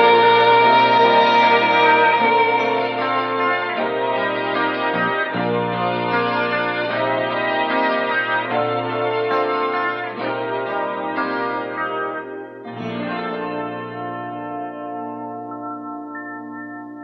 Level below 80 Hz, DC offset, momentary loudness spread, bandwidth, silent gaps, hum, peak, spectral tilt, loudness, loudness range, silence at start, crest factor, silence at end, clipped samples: -68 dBFS; under 0.1%; 17 LU; 6.2 kHz; none; none; -2 dBFS; -6.5 dB/octave; -18 LUFS; 13 LU; 0 s; 18 dB; 0 s; under 0.1%